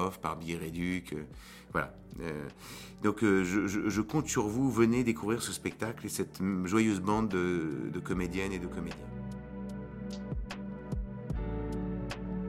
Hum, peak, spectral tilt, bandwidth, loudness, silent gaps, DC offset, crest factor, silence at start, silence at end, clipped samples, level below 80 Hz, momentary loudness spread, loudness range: none; -12 dBFS; -5.5 dB/octave; 16.5 kHz; -33 LUFS; none; under 0.1%; 20 dB; 0 s; 0 s; under 0.1%; -48 dBFS; 14 LU; 9 LU